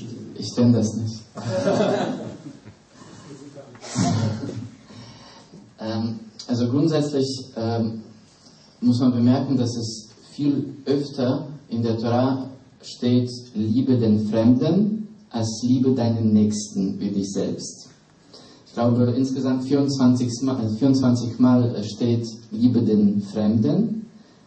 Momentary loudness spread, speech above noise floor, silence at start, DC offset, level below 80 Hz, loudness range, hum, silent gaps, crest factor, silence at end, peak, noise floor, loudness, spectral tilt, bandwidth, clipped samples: 17 LU; 30 dB; 0 s; under 0.1%; -62 dBFS; 7 LU; none; none; 16 dB; 0.3 s; -6 dBFS; -51 dBFS; -22 LUFS; -7 dB/octave; 8.8 kHz; under 0.1%